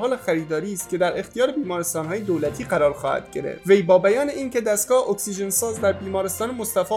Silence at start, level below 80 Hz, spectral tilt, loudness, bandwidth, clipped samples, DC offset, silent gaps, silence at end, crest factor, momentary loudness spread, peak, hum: 0 s; -54 dBFS; -4 dB/octave; -22 LUFS; 17.5 kHz; under 0.1%; under 0.1%; none; 0 s; 18 dB; 8 LU; -4 dBFS; none